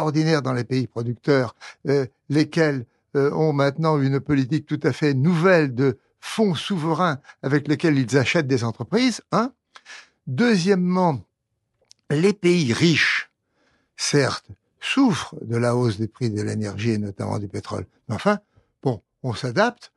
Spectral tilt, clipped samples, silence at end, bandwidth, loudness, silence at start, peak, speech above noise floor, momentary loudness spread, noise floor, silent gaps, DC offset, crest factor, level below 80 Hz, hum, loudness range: -6 dB/octave; under 0.1%; 0.1 s; 12 kHz; -22 LUFS; 0 s; -4 dBFS; 54 dB; 12 LU; -76 dBFS; none; under 0.1%; 18 dB; -62 dBFS; none; 4 LU